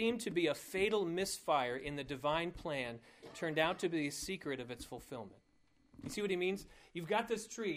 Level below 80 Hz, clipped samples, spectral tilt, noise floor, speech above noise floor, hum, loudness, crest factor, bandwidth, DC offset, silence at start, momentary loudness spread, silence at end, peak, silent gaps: -64 dBFS; under 0.1%; -4 dB/octave; -72 dBFS; 34 dB; none; -38 LUFS; 20 dB; 15.5 kHz; under 0.1%; 0 s; 13 LU; 0 s; -18 dBFS; none